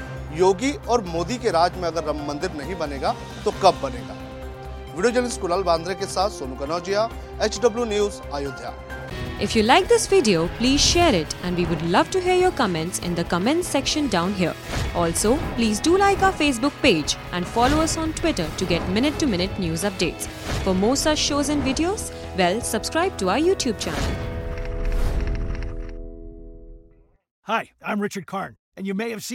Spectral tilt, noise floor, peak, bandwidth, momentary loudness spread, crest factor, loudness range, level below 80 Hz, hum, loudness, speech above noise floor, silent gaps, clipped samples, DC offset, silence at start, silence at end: -4 dB/octave; -54 dBFS; -2 dBFS; 17 kHz; 13 LU; 22 dB; 10 LU; -34 dBFS; none; -22 LUFS; 32 dB; 27.31-27.42 s, 28.59-28.72 s; under 0.1%; under 0.1%; 0 s; 0 s